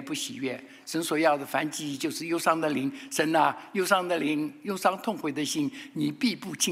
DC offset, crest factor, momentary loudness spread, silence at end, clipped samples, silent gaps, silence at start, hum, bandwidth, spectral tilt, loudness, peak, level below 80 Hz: under 0.1%; 20 dB; 8 LU; 0 s; under 0.1%; none; 0 s; none; 16 kHz; -3.5 dB/octave; -28 LUFS; -8 dBFS; -78 dBFS